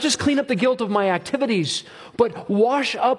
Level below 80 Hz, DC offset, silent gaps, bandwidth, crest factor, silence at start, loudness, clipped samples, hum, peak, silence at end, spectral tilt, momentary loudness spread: -60 dBFS; under 0.1%; none; 11.5 kHz; 16 dB; 0 s; -21 LUFS; under 0.1%; none; -4 dBFS; 0 s; -4 dB/octave; 4 LU